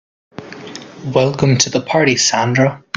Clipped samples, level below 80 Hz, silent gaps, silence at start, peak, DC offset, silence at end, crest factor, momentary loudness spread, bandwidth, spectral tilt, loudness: under 0.1%; -50 dBFS; none; 0.4 s; 0 dBFS; under 0.1%; 0.2 s; 16 dB; 20 LU; 9.4 kHz; -4 dB/octave; -14 LUFS